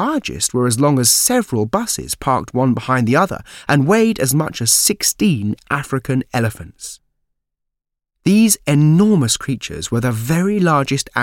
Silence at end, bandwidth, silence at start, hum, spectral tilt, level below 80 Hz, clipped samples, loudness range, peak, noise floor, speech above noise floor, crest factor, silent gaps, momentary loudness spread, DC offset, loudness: 0 s; 17 kHz; 0 s; none; -4.5 dB/octave; -46 dBFS; under 0.1%; 4 LU; 0 dBFS; -80 dBFS; 64 dB; 16 dB; none; 10 LU; under 0.1%; -16 LUFS